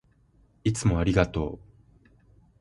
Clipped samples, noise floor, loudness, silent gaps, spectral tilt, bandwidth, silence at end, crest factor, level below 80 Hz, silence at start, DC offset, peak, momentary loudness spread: under 0.1%; -62 dBFS; -26 LUFS; none; -6.5 dB/octave; 11.5 kHz; 1.05 s; 22 dB; -40 dBFS; 0.65 s; under 0.1%; -8 dBFS; 11 LU